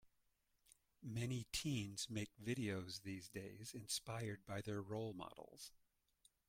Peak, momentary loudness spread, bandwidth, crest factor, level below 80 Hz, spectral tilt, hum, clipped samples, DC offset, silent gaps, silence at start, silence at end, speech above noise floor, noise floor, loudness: -30 dBFS; 12 LU; 16.5 kHz; 18 dB; -72 dBFS; -4.5 dB/octave; none; under 0.1%; under 0.1%; none; 0.05 s; 0.7 s; 37 dB; -84 dBFS; -47 LUFS